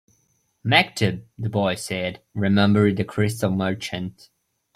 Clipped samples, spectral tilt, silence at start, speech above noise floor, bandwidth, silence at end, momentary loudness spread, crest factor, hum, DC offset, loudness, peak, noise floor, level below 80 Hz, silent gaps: under 0.1%; -5.5 dB/octave; 0.65 s; 45 dB; 15 kHz; 0.65 s; 12 LU; 20 dB; none; under 0.1%; -22 LUFS; -2 dBFS; -67 dBFS; -58 dBFS; none